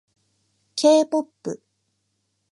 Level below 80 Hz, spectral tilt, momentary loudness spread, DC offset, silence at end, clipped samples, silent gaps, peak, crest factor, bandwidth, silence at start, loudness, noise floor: -82 dBFS; -4 dB/octave; 17 LU; under 0.1%; 0.95 s; under 0.1%; none; -4 dBFS; 20 dB; 11.5 kHz; 0.75 s; -19 LUFS; -73 dBFS